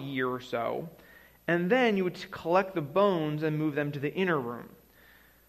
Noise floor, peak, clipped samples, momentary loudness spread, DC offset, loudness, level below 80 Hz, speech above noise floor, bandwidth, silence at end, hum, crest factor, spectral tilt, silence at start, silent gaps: -58 dBFS; -12 dBFS; under 0.1%; 13 LU; under 0.1%; -29 LUFS; -66 dBFS; 30 dB; 15 kHz; 0.8 s; none; 18 dB; -7 dB/octave; 0 s; none